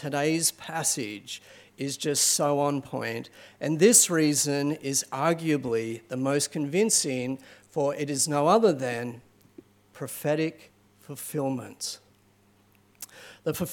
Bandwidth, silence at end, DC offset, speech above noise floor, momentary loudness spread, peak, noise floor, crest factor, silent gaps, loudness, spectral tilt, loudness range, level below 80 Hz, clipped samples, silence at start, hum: 17.5 kHz; 0 s; under 0.1%; 36 dB; 17 LU; -6 dBFS; -62 dBFS; 22 dB; none; -26 LUFS; -3.5 dB/octave; 10 LU; -72 dBFS; under 0.1%; 0 s; none